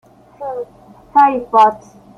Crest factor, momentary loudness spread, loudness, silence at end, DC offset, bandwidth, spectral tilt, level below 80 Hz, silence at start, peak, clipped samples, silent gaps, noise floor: 14 dB; 20 LU; -13 LUFS; 0.4 s; under 0.1%; 7.2 kHz; -5.5 dB/octave; -56 dBFS; 0.4 s; -2 dBFS; under 0.1%; none; -43 dBFS